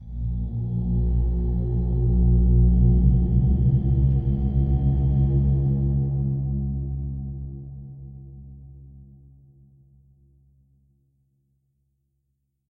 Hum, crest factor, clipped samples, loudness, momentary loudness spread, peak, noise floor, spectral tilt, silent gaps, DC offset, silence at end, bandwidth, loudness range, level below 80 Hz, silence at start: 60 Hz at -30 dBFS; 16 dB; under 0.1%; -23 LUFS; 19 LU; -6 dBFS; -75 dBFS; -14 dB/octave; none; under 0.1%; 3.65 s; 1.1 kHz; 16 LU; -26 dBFS; 0 s